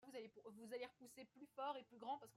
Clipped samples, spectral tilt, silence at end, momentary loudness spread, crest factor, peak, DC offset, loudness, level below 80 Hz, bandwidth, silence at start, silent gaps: under 0.1%; -3.5 dB/octave; 0 s; 12 LU; 20 dB; -34 dBFS; under 0.1%; -54 LUFS; under -90 dBFS; 16 kHz; 0 s; none